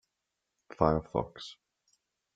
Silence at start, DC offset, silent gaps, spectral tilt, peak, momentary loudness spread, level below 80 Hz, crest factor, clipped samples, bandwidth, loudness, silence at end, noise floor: 0.8 s; under 0.1%; none; -7.5 dB/octave; -8 dBFS; 18 LU; -54 dBFS; 28 dB; under 0.1%; 8 kHz; -31 LUFS; 0.8 s; -85 dBFS